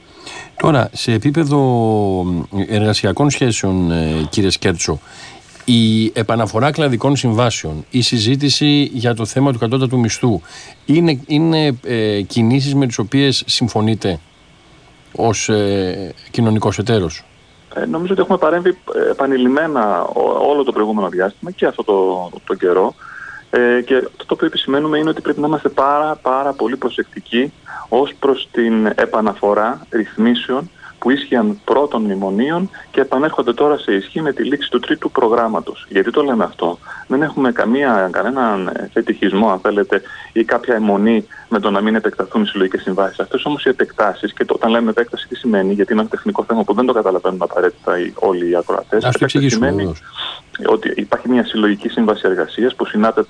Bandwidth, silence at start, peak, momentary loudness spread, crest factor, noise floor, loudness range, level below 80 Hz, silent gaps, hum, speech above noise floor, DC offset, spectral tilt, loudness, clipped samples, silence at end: 10.5 kHz; 0.15 s; 0 dBFS; 7 LU; 14 dB; -46 dBFS; 2 LU; -46 dBFS; none; none; 31 dB; under 0.1%; -5.5 dB/octave; -16 LUFS; under 0.1%; 0.05 s